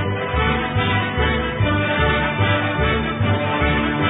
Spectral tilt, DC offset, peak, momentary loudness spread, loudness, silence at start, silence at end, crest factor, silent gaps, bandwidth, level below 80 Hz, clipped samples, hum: -11.5 dB/octave; under 0.1%; -4 dBFS; 2 LU; -19 LUFS; 0 s; 0 s; 14 dB; none; 4 kHz; -28 dBFS; under 0.1%; none